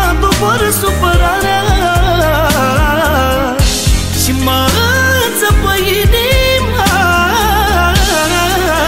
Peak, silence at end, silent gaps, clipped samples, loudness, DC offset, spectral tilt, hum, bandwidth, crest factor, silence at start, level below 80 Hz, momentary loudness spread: 0 dBFS; 0 s; none; under 0.1%; -11 LUFS; 1%; -4 dB/octave; none; 16.5 kHz; 10 dB; 0 s; -18 dBFS; 2 LU